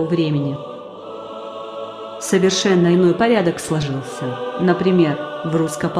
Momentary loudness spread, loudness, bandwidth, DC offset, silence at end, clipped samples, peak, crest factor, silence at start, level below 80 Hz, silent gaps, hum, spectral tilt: 16 LU; -18 LUFS; 13.5 kHz; under 0.1%; 0 s; under 0.1%; -2 dBFS; 16 dB; 0 s; -54 dBFS; none; none; -5.5 dB/octave